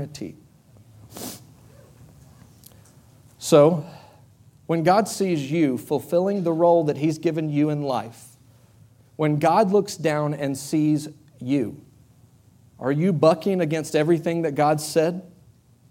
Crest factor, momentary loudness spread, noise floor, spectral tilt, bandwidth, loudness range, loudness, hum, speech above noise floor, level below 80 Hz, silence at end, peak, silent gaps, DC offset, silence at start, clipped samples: 20 dB; 18 LU; -54 dBFS; -6.5 dB/octave; 17 kHz; 3 LU; -22 LUFS; none; 33 dB; -64 dBFS; 0.65 s; -2 dBFS; none; under 0.1%; 0 s; under 0.1%